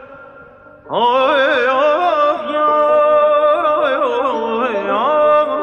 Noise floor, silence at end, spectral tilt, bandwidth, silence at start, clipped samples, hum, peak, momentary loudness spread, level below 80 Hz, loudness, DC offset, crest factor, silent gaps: -40 dBFS; 0 s; -4.5 dB/octave; 6.8 kHz; 0 s; under 0.1%; none; -4 dBFS; 6 LU; -60 dBFS; -14 LUFS; under 0.1%; 12 dB; none